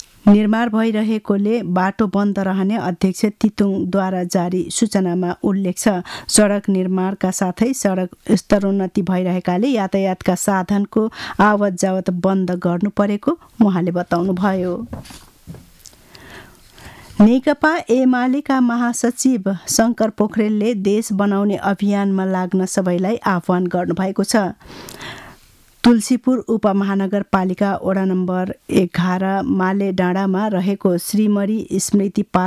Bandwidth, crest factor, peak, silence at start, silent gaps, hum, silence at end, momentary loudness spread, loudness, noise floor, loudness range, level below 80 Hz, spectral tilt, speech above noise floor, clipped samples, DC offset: 14.5 kHz; 14 dB; -4 dBFS; 0.25 s; none; none; 0 s; 5 LU; -18 LUFS; -49 dBFS; 3 LU; -50 dBFS; -5.5 dB/octave; 32 dB; under 0.1%; under 0.1%